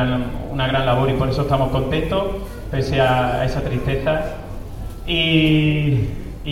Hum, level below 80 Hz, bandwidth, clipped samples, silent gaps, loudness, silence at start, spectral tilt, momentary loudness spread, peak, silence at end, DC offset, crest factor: none; -30 dBFS; 15.5 kHz; under 0.1%; none; -19 LUFS; 0 s; -7 dB/octave; 14 LU; -4 dBFS; 0 s; under 0.1%; 16 dB